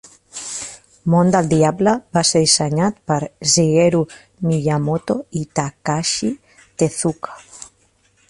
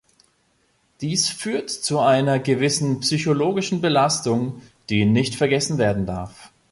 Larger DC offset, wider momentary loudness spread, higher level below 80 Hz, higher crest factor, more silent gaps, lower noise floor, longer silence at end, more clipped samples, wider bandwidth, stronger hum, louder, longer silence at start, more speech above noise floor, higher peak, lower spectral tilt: neither; first, 18 LU vs 9 LU; about the same, -52 dBFS vs -50 dBFS; about the same, 18 dB vs 16 dB; neither; second, -59 dBFS vs -64 dBFS; first, 0.65 s vs 0.25 s; neither; about the same, 11.5 kHz vs 11.5 kHz; neither; first, -18 LUFS vs -21 LUFS; second, 0.35 s vs 1 s; about the same, 42 dB vs 44 dB; first, 0 dBFS vs -6 dBFS; about the same, -4.5 dB/octave vs -4.5 dB/octave